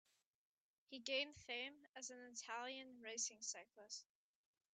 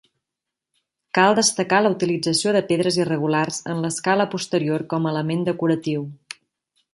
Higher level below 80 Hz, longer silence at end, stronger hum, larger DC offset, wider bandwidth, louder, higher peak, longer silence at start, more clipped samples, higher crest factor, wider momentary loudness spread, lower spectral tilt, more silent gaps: second, under -90 dBFS vs -66 dBFS; about the same, 0.7 s vs 0.8 s; neither; neither; second, 9.4 kHz vs 11.5 kHz; second, -49 LUFS vs -21 LUFS; second, -28 dBFS vs -2 dBFS; second, 0.9 s vs 1.15 s; neither; about the same, 24 dB vs 20 dB; about the same, 11 LU vs 9 LU; second, 0.5 dB/octave vs -4.5 dB/octave; first, 1.89-1.94 s vs none